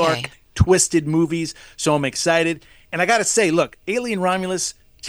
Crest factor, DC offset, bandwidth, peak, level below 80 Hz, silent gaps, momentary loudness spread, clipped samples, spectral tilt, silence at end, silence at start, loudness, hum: 20 dB; under 0.1%; over 20 kHz; 0 dBFS; -42 dBFS; none; 10 LU; under 0.1%; -4 dB/octave; 0 s; 0 s; -19 LUFS; none